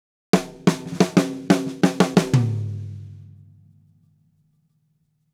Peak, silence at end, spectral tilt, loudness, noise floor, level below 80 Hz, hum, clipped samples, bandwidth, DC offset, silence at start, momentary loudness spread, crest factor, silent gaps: 0 dBFS; 2.1 s; -6 dB/octave; -21 LUFS; -68 dBFS; -58 dBFS; none; under 0.1%; 15.5 kHz; under 0.1%; 0.35 s; 15 LU; 22 dB; none